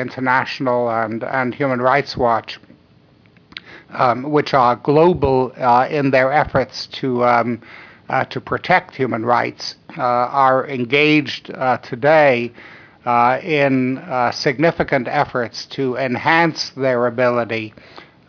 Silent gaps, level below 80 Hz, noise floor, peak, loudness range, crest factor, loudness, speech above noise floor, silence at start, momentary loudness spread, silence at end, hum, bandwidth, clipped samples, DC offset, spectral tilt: none; -48 dBFS; -51 dBFS; -2 dBFS; 3 LU; 16 dB; -17 LUFS; 34 dB; 0 s; 10 LU; 0.25 s; none; 5.4 kHz; under 0.1%; under 0.1%; -6 dB/octave